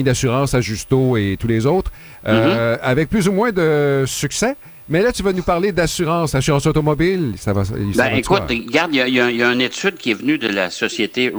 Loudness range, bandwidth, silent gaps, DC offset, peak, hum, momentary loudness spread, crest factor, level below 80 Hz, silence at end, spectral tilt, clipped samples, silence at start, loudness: 1 LU; over 20 kHz; none; under 0.1%; -2 dBFS; none; 5 LU; 16 dB; -38 dBFS; 0 s; -5 dB/octave; under 0.1%; 0 s; -17 LUFS